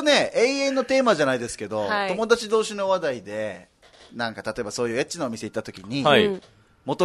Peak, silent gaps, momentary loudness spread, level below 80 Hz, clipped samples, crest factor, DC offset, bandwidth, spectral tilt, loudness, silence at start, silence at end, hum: -4 dBFS; none; 13 LU; -60 dBFS; under 0.1%; 20 dB; under 0.1%; 12.5 kHz; -4 dB/octave; -23 LUFS; 0 s; 0 s; none